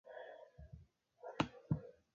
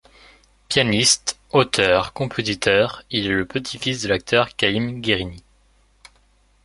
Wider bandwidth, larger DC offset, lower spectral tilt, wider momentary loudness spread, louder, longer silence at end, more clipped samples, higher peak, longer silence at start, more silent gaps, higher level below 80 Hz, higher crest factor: second, 7 kHz vs 11.5 kHz; neither; first, -5.5 dB/octave vs -3 dB/octave; first, 18 LU vs 8 LU; second, -45 LUFS vs -20 LUFS; second, 0.25 s vs 1.25 s; neither; second, -18 dBFS vs -2 dBFS; second, 0.05 s vs 0.7 s; neither; second, -64 dBFS vs -48 dBFS; first, 28 dB vs 20 dB